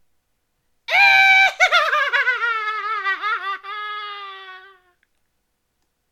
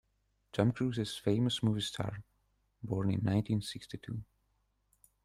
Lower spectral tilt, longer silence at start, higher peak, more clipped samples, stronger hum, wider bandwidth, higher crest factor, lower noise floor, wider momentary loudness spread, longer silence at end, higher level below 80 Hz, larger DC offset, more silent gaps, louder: second, 1.5 dB/octave vs -6.5 dB/octave; first, 0.9 s vs 0.55 s; first, -2 dBFS vs -16 dBFS; neither; neither; first, 16 kHz vs 14 kHz; about the same, 18 dB vs 20 dB; second, -71 dBFS vs -77 dBFS; first, 21 LU vs 13 LU; first, 1.5 s vs 1 s; second, -68 dBFS vs -62 dBFS; neither; neither; first, -16 LUFS vs -35 LUFS